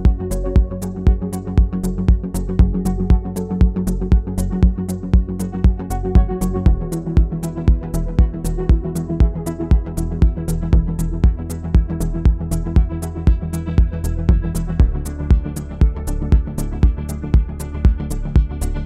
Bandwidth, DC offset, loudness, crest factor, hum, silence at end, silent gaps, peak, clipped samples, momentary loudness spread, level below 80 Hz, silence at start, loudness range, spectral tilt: 13.5 kHz; under 0.1%; -19 LUFS; 16 dB; none; 0 s; none; 0 dBFS; under 0.1%; 5 LU; -18 dBFS; 0 s; 1 LU; -8 dB/octave